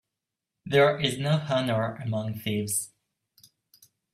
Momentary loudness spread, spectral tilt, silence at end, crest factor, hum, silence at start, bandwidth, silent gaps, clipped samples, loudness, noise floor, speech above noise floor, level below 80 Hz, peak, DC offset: 9 LU; -4.5 dB/octave; 1.25 s; 20 dB; none; 0.65 s; 16 kHz; none; under 0.1%; -26 LUFS; -87 dBFS; 61 dB; -66 dBFS; -8 dBFS; under 0.1%